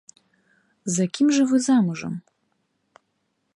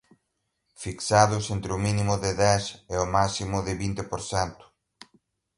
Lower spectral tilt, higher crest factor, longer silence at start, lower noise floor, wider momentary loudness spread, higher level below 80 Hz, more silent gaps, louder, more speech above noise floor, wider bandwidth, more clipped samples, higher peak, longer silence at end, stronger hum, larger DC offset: about the same, -5 dB/octave vs -4.5 dB/octave; second, 16 dB vs 22 dB; about the same, 0.85 s vs 0.8 s; second, -73 dBFS vs -78 dBFS; first, 16 LU vs 11 LU; second, -72 dBFS vs -46 dBFS; neither; first, -21 LUFS vs -26 LUFS; about the same, 53 dB vs 53 dB; about the same, 11.5 kHz vs 11.5 kHz; neither; second, -10 dBFS vs -4 dBFS; first, 1.35 s vs 1.05 s; neither; neither